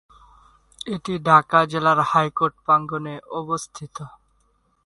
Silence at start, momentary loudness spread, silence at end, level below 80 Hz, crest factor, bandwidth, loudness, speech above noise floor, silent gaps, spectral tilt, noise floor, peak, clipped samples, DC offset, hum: 0.85 s; 20 LU; 0.8 s; -58 dBFS; 22 dB; 11.5 kHz; -20 LUFS; 44 dB; none; -5.5 dB/octave; -65 dBFS; -2 dBFS; under 0.1%; under 0.1%; none